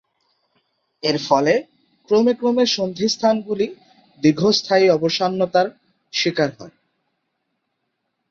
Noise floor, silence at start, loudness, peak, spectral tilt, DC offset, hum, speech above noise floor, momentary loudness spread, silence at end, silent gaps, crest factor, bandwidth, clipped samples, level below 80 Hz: -75 dBFS; 1.05 s; -19 LUFS; -2 dBFS; -4.5 dB/octave; under 0.1%; none; 56 dB; 8 LU; 1.6 s; none; 18 dB; 7.6 kHz; under 0.1%; -62 dBFS